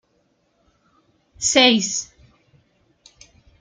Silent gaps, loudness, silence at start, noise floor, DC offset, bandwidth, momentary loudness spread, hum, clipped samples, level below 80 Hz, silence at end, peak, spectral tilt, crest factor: none; -17 LUFS; 1.4 s; -65 dBFS; under 0.1%; 10 kHz; 15 LU; none; under 0.1%; -60 dBFS; 1.55 s; -2 dBFS; -1.5 dB/octave; 22 dB